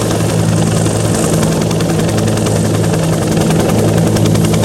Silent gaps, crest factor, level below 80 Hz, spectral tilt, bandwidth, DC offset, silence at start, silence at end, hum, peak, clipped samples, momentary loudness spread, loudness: none; 12 dB; -30 dBFS; -5.5 dB/octave; 16.5 kHz; under 0.1%; 0 s; 0 s; none; 0 dBFS; under 0.1%; 2 LU; -12 LUFS